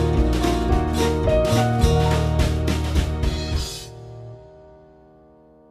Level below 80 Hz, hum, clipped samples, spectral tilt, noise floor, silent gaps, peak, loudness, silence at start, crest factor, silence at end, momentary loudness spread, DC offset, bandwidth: -26 dBFS; none; under 0.1%; -6 dB/octave; -51 dBFS; none; -4 dBFS; -21 LUFS; 0 s; 16 dB; 1.25 s; 18 LU; under 0.1%; 14 kHz